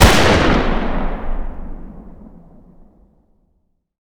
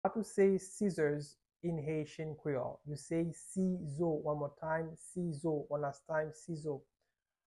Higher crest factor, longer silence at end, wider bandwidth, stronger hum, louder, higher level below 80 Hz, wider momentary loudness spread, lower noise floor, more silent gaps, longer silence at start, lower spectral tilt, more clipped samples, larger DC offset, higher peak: about the same, 18 dB vs 18 dB; first, 1.85 s vs 0.7 s; first, over 20 kHz vs 12 kHz; neither; first, -16 LUFS vs -38 LUFS; first, -22 dBFS vs -70 dBFS; first, 25 LU vs 11 LU; second, -64 dBFS vs -88 dBFS; neither; about the same, 0 s vs 0.05 s; second, -4.5 dB/octave vs -7 dB/octave; first, 0.1% vs under 0.1%; neither; first, 0 dBFS vs -20 dBFS